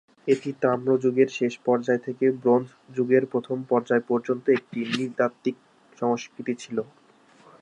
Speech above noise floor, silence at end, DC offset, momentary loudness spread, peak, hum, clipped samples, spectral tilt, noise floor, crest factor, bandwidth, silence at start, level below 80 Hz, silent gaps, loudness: 32 dB; 0.8 s; under 0.1%; 9 LU; -6 dBFS; none; under 0.1%; -6.5 dB/octave; -56 dBFS; 18 dB; 9.6 kHz; 0.25 s; -76 dBFS; none; -25 LUFS